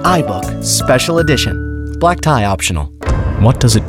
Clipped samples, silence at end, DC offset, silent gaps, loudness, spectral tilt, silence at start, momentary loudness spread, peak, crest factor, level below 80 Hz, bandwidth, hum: under 0.1%; 0 s; under 0.1%; none; -14 LUFS; -4.5 dB/octave; 0 s; 8 LU; 0 dBFS; 12 dB; -24 dBFS; 16.5 kHz; none